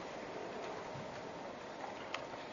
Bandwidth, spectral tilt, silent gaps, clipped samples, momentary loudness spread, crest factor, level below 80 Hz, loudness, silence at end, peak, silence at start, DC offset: 7.2 kHz; -3 dB/octave; none; under 0.1%; 3 LU; 24 dB; -74 dBFS; -46 LUFS; 0 s; -20 dBFS; 0 s; under 0.1%